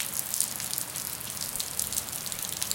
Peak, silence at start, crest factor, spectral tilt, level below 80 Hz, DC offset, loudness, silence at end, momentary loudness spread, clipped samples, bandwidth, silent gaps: -4 dBFS; 0 s; 30 dB; -0.5 dB/octave; -60 dBFS; under 0.1%; -30 LUFS; 0 s; 5 LU; under 0.1%; 17.5 kHz; none